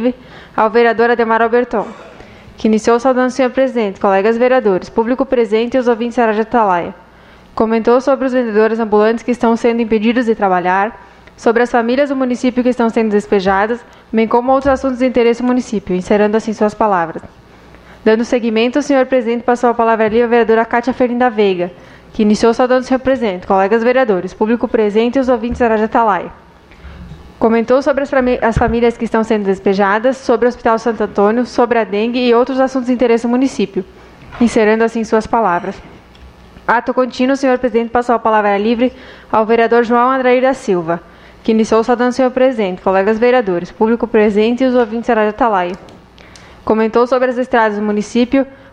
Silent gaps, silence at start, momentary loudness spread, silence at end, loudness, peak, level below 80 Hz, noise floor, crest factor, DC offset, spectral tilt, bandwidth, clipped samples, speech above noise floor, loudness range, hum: none; 0 s; 6 LU; 0.15 s; -14 LUFS; 0 dBFS; -40 dBFS; -41 dBFS; 14 dB; under 0.1%; -6 dB/octave; 10 kHz; under 0.1%; 28 dB; 2 LU; none